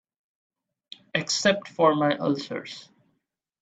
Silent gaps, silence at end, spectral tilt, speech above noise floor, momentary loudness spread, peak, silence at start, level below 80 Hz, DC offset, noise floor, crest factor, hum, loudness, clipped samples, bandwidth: none; 0.75 s; -4 dB/octave; 53 dB; 15 LU; -8 dBFS; 1.15 s; -70 dBFS; under 0.1%; -78 dBFS; 20 dB; none; -25 LUFS; under 0.1%; 9.2 kHz